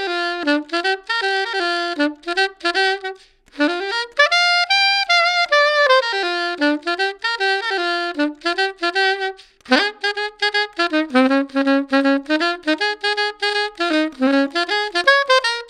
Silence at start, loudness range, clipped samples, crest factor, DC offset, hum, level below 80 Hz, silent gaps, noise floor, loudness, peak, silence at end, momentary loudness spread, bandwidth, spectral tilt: 0 s; 4 LU; under 0.1%; 18 dB; under 0.1%; none; -62 dBFS; none; -38 dBFS; -18 LUFS; 0 dBFS; 0 s; 7 LU; 11 kHz; -1 dB/octave